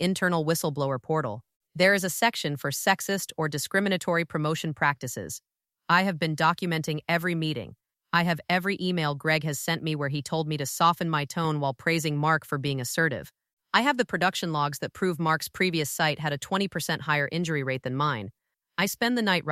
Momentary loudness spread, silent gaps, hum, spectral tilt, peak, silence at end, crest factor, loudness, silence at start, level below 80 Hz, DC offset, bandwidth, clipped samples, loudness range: 6 LU; 1.56-1.60 s, 13.53-13.57 s; none; -4.5 dB/octave; -6 dBFS; 0 s; 20 dB; -26 LUFS; 0 s; -66 dBFS; under 0.1%; 16 kHz; under 0.1%; 2 LU